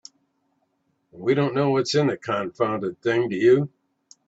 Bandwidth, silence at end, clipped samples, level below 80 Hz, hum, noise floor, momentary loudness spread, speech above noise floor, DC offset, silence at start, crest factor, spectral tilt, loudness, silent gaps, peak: 8 kHz; 0.6 s; under 0.1%; -66 dBFS; none; -71 dBFS; 8 LU; 49 dB; under 0.1%; 1.15 s; 18 dB; -6 dB/octave; -22 LUFS; none; -6 dBFS